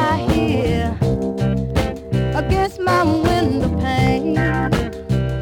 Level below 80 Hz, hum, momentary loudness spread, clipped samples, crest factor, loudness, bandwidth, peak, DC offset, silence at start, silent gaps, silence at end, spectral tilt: -30 dBFS; none; 5 LU; under 0.1%; 16 dB; -19 LUFS; 17 kHz; -2 dBFS; under 0.1%; 0 s; none; 0 s; -7 dB/octave